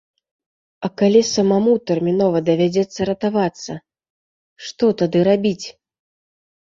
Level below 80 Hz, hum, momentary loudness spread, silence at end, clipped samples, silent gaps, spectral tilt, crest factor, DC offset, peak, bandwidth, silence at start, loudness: -58 dBFS; none; 17 LU; 0.95 s; under 0.1%; 4.10-4.56 s; -6 dB/octave; 18 dB; under 0.1%; -2 dBFS; 7.6 kHz; 0.8 s; -18 LUFS